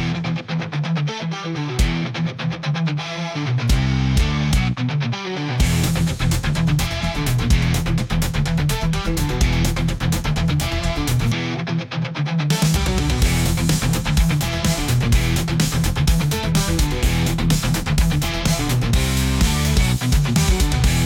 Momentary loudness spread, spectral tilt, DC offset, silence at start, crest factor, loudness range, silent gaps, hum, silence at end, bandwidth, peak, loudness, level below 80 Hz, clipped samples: 6 LU; -5 dB/octave; under 0.1%; 0 s; 14 dB; 2 LU; none; none; 0 s; 17 kHz; -4 dBFS; -20 LUFS; -24 dBFS; under 0.1%